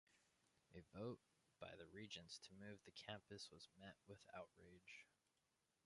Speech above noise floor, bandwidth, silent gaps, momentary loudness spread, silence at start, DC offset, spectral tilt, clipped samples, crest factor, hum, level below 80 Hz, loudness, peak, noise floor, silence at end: 29 dB; 11 kHz; none; 9 LU; 0.1 s; under 0.1%; -4 dB/octave; under 0.1%; 24 dB; none; -82 dBFS; -59 LUFS; -36 dBFS; -88 dBFS; 0.75 s